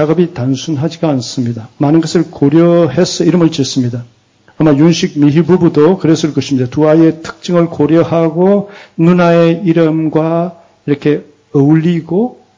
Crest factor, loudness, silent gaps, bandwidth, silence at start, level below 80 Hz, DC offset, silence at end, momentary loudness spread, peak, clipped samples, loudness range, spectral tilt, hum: 10 dB; -11 LUFS; none; 7.6 kHz; 0 s; -48 dBFS; under 0.1%; 0.25 s; 9 LU; 0 dBFS; under 0.1%; 2 LU; -7 dB/octave; none